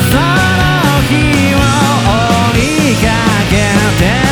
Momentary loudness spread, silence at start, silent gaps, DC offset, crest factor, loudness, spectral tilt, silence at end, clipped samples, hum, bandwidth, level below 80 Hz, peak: 1 LU; 0 s; none; under 0.1%; 8 dB; -10 LUFS; -5 dB/octave; 0 s; under 0.1%; none; over 20 kHz; -22 dBFS; -2 dBFS